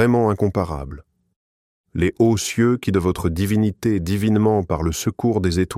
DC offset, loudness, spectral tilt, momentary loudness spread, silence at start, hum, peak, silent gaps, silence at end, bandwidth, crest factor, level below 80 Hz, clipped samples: under 0.1%; -20 LUFS; -6.5 dB/octave; 6 LU; 0 s; none; -4 dBFS; 1.36-1.84 s; 0 s; 15.5 kHz; 16 dB; -38 dBFS; under 0.1%